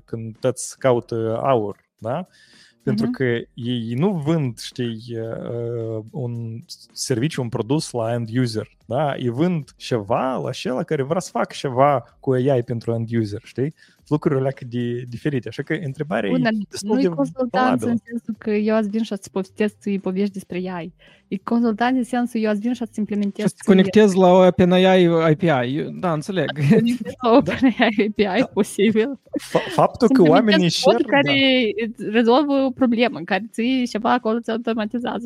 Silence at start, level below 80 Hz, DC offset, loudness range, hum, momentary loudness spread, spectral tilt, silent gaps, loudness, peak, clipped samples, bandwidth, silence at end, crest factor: 0.1 s; -58 dBFS; under 0.1%; 8 LU; none; 13 LU; -6 dB/octave; none; -20 LUFS; -2 dBFS; under 0.1%; 14.5 kHz; 0 s; 18 dB